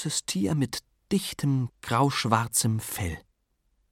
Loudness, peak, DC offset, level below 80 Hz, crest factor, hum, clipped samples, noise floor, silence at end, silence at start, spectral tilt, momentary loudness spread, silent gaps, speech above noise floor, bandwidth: -27 LUFS; -8 dBFS; under 0.1%; -52 dBFS; 20 dB; none; under 0.1%; -72 dBFS; 0.7 s; 0 s; -4.5 dB/octave; 9 LU; none; 45 dB; 17 kHz